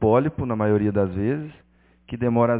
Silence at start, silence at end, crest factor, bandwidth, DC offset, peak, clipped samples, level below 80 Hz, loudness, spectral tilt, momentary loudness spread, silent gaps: 0 s; 0 s; 16 dB; 4 kHz; under 0.1%; -6 dBFS; under 0.1%; -44 dBFS; -23 LUFS; -12.5 dB/octave; 11 LU; none